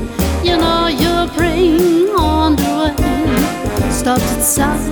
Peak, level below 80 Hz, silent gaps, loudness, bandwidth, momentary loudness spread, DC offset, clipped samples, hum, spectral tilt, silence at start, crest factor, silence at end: -2 dBFS; -24 dBFS; none; -14 LUFS; over 20 kHz; 4 LU; under 0.1%; under 0.1%; none; -4.5 dB/octave; 0 s; 12 dB; 0 s